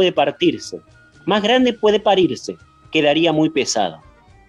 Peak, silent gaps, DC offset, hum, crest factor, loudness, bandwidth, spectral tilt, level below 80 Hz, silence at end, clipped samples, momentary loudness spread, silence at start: -2 dBFS; none; under 0.1%; none; 16 dB; -17 LUFS; 11.5 kHz; -4 dB/octave; -54 dBFS; 0.55 s; under 0.1%; 16 LU; 0 s